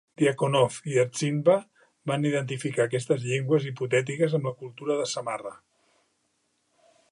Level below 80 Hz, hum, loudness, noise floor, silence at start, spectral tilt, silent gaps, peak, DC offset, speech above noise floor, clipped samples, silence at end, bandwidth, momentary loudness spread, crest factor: -74 dBFS; none; -26 LUFS; -73 dBFS; 0.2 s; -5.5 dB/octave; none; -8 dBFS; under 0.1%; 47 dB; under 0.1%; 1.55 s; 11.5 kHz; 10 LU; 18 dB